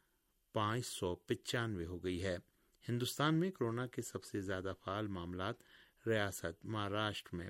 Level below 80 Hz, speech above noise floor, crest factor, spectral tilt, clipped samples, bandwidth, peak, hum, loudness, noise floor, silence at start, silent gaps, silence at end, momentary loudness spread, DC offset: -70 dBFS; 39 dB; 18 dB; -5 dB/octave; under 0.1%; 16 kHz; -22 dBFS; none; -40 LUFS; -79 dBFS; 0.55 s; none; 0 s; 8 LU; under 0.1%